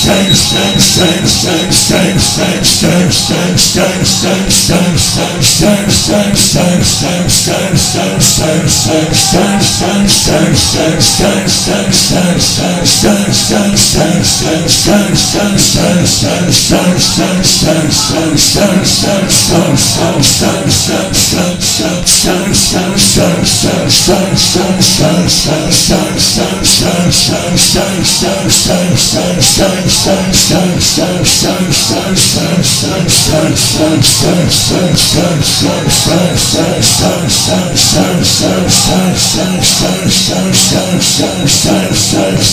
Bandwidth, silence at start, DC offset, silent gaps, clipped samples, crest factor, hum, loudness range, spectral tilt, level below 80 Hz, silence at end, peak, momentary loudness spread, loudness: over 20 kHz; 0 s; under 0.1%; none; 0.6%; 8 dB; none; 1 LU; -3.5 dB/octave; -28 dBFS; 0 s; 0 dBFS; 3 LU; -8 LUFS